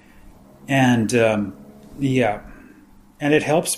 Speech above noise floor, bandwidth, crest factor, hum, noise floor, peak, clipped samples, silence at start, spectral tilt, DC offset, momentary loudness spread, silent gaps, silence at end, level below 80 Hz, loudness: 30 dB; 15.5 kHz; 20 dB; none; -48 dBFS; -2 dBFS; under 0.1%; 0.25 s; -5 dB/octave; under 0.1%; 9 LU; none; 0 s; -50 dBFS; -20 LUFS